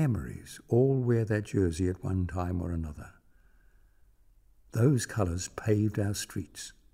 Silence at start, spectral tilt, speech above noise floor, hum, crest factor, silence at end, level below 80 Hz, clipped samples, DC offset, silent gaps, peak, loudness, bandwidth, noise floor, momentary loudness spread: 0 s; -6.5 dB/octave; 32 dB; none; 18 dB; 0.2 s; -50 dBFS; under 0.1%; under 0.1%; none; -12 dBFS; -30 LUFS; 16 kHz; -61 dBFS; 16 LU